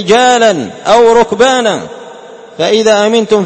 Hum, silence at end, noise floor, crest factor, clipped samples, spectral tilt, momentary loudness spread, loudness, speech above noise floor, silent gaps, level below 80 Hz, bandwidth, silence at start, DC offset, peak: none; 0 s; -31 dBFS; 10 dB; 0.4%; -3.5 dB/octave; 11 LU; -9 LUFS; 23 dB; none; -46 dBFS; 8.8 kHz; 0 s; under 0.1%; 0 dBFS